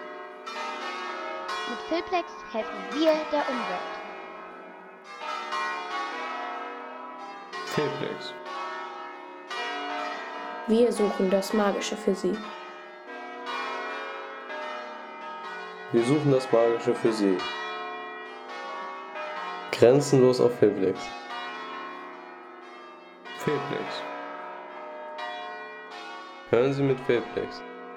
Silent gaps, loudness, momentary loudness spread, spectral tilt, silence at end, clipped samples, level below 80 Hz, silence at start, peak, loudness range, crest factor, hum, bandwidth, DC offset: none; -28 LUFS; 17 LU; -5.5 dB/octave; 0 s; under 0.1%; -68 dBFS; 0 s; -6 dBFS; 10 LU; 22 dB; none; 16 kHz; under 0.1%